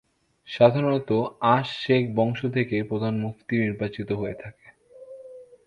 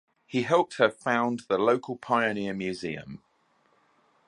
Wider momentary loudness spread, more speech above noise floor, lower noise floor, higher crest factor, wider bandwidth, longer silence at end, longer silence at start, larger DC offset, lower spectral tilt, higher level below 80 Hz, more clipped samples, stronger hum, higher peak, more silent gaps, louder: first, 19 LU vs 11 LU; second, 25 dB vs 41 dB; second, -48 dBFS vs -67 dBFS; about the same, 22 dB vs 22 dB; second, 8.6 kHz vs 11 kHz; second, 0.25 s vs 1.1 s; first, 0.45 s vs 0.3 s; neither; first, -8 dB/octave vs -5.5 dB/octave; first, -58 dBFS vs -68 dBFS; neither; neither; first, -2 dBFS vs -6 dBFS; neither; first, -24 LUFS vs -27 LUFS